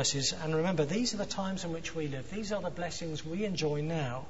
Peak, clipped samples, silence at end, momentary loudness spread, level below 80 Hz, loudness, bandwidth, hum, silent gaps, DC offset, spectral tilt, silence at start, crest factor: -18 dBFS; under 0.1%; 0 s; 7 LU; -56 dBFS; -34 LUFS; 8.2 kHz; none; none; 0.6%; -4 dB/octave; 0 s; 16 dB